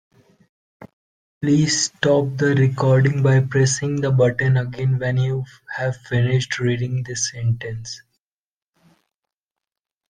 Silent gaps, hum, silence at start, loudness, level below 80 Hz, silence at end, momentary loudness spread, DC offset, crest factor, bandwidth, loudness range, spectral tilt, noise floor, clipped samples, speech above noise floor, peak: 0.93-1.41 s; none; 0.8 s; -19 LUFS; -54 dBFS; 2.15 s; 10 LU; under 0.1%; 18 dB; 9.8 kHz; 8 LU; -5.5 dB/octave; under -90 dBFS; under 0.1%; over 71 dB; -2 dBFS